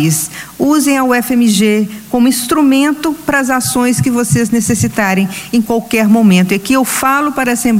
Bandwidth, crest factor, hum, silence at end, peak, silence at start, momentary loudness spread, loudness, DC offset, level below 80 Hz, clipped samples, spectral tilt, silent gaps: 16.5 kHz; 12 dB; none; 0 s; 0 dBFS; 0 s; 6 LU; -12 LUFS; under 0.1%; -44 dBFS; under 0.1%; -4.5 dB/octave; none